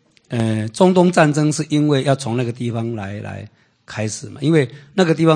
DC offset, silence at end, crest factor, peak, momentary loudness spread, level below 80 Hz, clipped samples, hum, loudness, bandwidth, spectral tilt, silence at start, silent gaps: under 0.1%; 0 s; 18 dB; 0 dBFS; 14 LU; -58 dBFS; under 0.1%; none; -18 LUFS; 9.8 kHz; -6 dB/octave; 0.3 s; none